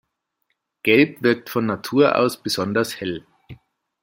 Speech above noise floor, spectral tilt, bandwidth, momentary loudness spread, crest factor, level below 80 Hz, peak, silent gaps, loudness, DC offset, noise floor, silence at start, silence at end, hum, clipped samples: 54 dB; -5 dB/octave; 16.5 kHz; 10 LU; 20 dB; -62 dBFS; -2 dBFS; none; -20 LUFS; under 0.1%; -74 dBFS; 0.85 s; 0.5 s; none; under 0.1%